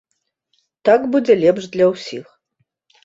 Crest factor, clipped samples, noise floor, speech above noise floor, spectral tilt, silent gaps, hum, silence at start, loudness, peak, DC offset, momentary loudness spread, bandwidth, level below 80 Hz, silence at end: 16 dB; under 0.1%; -70 dBFS; 55 dB; -6 dB/octave; none; none; 0.85 s; -16 LUFS; -2 dBFS; under 0.1%; 15 LU; 7.8 kHz; -62 dBFS; 0.85 s